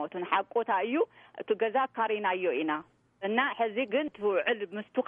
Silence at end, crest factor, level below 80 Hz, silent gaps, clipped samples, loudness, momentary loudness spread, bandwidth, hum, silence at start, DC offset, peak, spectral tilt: 0 s; 18 dB; -78 dBFS; none; under 0.1%; -30 LUFS; 6 LU; 4 kHz; none; 0 s; under 0.1%; -12 dBFS; -7.5 dB/octave